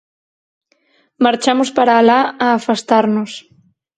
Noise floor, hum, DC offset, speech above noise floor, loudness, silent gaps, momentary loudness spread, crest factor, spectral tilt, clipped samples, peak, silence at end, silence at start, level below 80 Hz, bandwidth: -59 dBFS; none; under 0.1%; 45 dB; -14 LUFS; none; 9 LU; 16 dB; -4.5 dB/octave; under 0.1%; 0 dBFS; 0.6 s; 1.2 s; -64 dBFS; 9.4 kHz